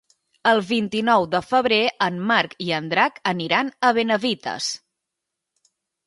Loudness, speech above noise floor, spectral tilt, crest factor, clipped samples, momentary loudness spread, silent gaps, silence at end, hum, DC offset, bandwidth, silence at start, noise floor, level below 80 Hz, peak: -21 LUFS; 62 dB; -4 dB/octave; 20 dB; under 0.1%; 7 LU; none; 1.3 s; none; under 0.1%; 11.5 kHz; 0.45 s; -83 dBFS; -64 dBFS; -2 dBFS